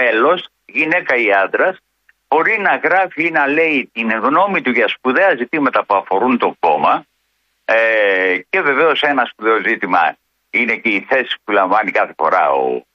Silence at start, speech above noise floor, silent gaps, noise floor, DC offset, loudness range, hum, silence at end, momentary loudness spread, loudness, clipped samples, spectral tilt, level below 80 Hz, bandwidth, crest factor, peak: 0 s; 51 dB; none; -66 dBFS; under 0.1%; 1 LU; none; 0.15 s; 4 LU; -15 LUFS; under 0.1%; -6 dB/octave; -66 dBFS; 6.8 kHz; 14 dB; -2 dBFS